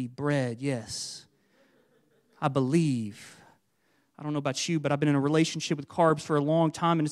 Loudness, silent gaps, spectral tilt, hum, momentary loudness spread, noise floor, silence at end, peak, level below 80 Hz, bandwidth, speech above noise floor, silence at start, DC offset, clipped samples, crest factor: -28 LUFS; none; -5.5 dB/octave; none; 11 LU; -71 dBFS; 0 s; -10 dBFS; -70 dBFS; 12.5 kHz; 44 dB; 0 s; under 0.1%; under 0.1%; 20 dB